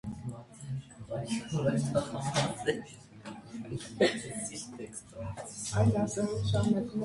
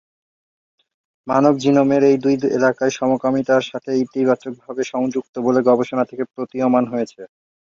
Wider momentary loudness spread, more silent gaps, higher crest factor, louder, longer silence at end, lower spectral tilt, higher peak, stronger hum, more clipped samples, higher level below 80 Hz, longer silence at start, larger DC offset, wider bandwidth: first, 15 LU vs 10 LU; second, none vs 5.29-5.33 s; about the same, 18 dB vs 16 dB; second, -33 LUFS vs -18 LUFS; second, 0 s vs 0.4 s; about the same, -5.5 dB/octave vs -6.5 dB/octave; second, -14 dBFS vs -2 dBFS; neither; neither; first, -54 dBFS vs -62 dBFS; second, 0.05 s vs 1.25 s; neither; first, 11.5 kHz vs 7.4 kHz